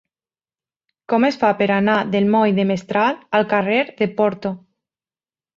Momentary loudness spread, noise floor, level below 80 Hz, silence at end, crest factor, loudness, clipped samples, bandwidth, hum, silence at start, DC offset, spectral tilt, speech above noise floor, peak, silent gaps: 6 LU; under -90 dBFS; -62 dBFS; 1 s; 18 dB; -18 LUFS; under 0.1%; 7.2 kHz; none; 1.1 s; under 0.1%; -7 dB/octave; over 72 dB; -2 dBFS; none